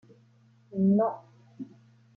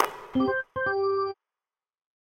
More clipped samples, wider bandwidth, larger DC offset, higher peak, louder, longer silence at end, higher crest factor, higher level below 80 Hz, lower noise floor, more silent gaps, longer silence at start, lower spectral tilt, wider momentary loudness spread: neither; second, 1.8 kHz vs 16 kHz; neither; second, -14 dBFS vs -6 dBFS; about the same, -27 LUFS vs -28 LUFS; second, 0.5 s vs 1 s; second, 16 dB vs 24 dB; second, -78 dBFS vs -62 dBFS; second, -61 dBFS vs under -90 dBFS; neither; first, 0.7 s vs 0 s; first, -12 dB/octave vs -6 dB/octave; first, 21 LU vs 6 LU